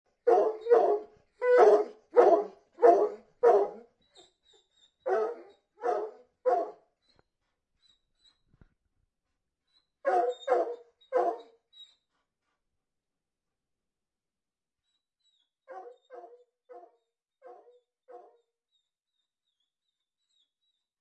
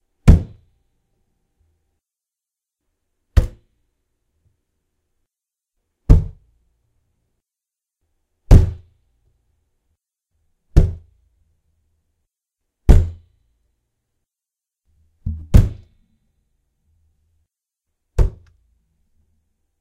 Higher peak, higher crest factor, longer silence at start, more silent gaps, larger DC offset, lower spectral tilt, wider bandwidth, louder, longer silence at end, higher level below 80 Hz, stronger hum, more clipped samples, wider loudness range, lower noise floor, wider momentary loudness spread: second, -8 dBFS vs 0 dBFS; about the same, 22 dB vs 20 dB; about the same, 0.25 s vs 0.25 s; neither; neither; second, -4.5 dB/octave vs -8.5 dB/octave; second, 8.2 kHz vs 10 kHz; second, -27 LUFS vs -18 LUFS; first, 2.85 s vs 1.5 s; second, -80 dBFS vs -22 dBFS; neither; neither; first, 14 LU vs 9 LU; about the same, under -90 dBFS vs -87 dBFS; about the same, 20 LU vs 21 LU